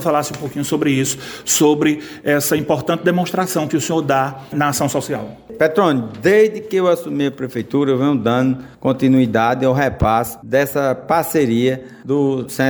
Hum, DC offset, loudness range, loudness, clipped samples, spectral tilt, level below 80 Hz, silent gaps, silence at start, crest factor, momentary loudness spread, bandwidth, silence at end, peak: none; under 0.1%; 2 LU; -17 LUFS; under 0.1%; -5 dB/octave; -44 dBFS; none; 0 s; 16 dB; 7 LU; over 20 kHz; 0 s; -2 dBFS